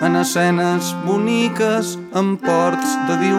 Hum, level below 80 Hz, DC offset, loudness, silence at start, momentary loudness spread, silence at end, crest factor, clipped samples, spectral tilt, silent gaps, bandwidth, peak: none; -66 dBFS; under 0.1%; -18 LUFS; 0 s; 4 LU; 0 s; 14 dB; under 0.1%; -5 dB/octave; none; 16 kHz; -4 dBFS